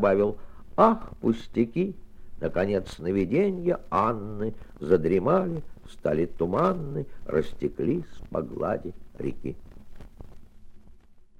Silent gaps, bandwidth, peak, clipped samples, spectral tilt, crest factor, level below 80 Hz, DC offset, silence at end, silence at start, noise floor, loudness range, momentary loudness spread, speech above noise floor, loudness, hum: none; 10.5 kHz; -4 dBFS; under 0.1%; -8.5 dB/octave; 22 dB; -46 dBFS; under 0.1%; 0.15 s; 0 s; -49 dBFS; 7 LU; 13 LU; 23 dB; -27 LUFS; none